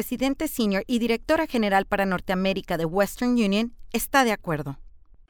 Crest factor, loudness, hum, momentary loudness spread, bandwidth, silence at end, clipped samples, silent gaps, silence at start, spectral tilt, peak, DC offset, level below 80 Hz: 20 dB; -24 LUFS; none; 8 LU; over 20 kHz; 0.35 s; under 0.1%; none; 0 s; -5 dB/octave; -4 dBFS; under 0.1%; -46 dBFS